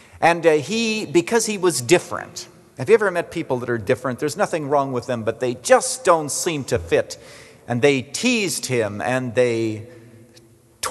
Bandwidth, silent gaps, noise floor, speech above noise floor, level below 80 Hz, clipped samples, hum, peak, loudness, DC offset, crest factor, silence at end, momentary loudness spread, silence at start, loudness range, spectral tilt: 12.5 kHz; none; -51 dBFS; 31 dB; -58 dBFS; under 0.1%; none; -2 dBFS; -20 LUFS; under 0.1%; 20 dB; 0 s; 11 LU; 0.15 s; 2 LU; -4 dB/octave